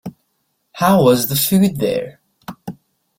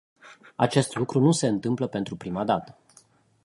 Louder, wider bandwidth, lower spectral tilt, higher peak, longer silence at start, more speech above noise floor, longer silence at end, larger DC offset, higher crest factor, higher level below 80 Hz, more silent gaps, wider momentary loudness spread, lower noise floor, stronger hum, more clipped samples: first, -15 LUFS vs -25 LUFS; first, 16.5 kHz vs 11.5 kHz; about the same, -5.5 dB/octave vs -6 dB/octave; first, -2 dBFS vs -6 dBFS; second, 0.05 s vs 0.25 s; first, 54 dB vs 34 dB; second, 0.45 s vs 0.8 s; neither; about the same, 16 dB vs 20 dB; first, -52 dBFS vs -62 dBFS; neither; first, 23 LU vs 10 LU; first, -68 dBFS vs -59 dBFS; neither; neither